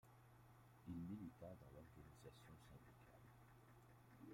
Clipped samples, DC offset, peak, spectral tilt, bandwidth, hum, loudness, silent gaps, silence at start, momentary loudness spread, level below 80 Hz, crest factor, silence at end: under 0.1%; under 0.1%; -44 dBFS; -7 dB/octave; 16 kHz; none; -61 LUFS; none; 0.05 s; 14 LU; -76 dBFS; 18 dB; 0 s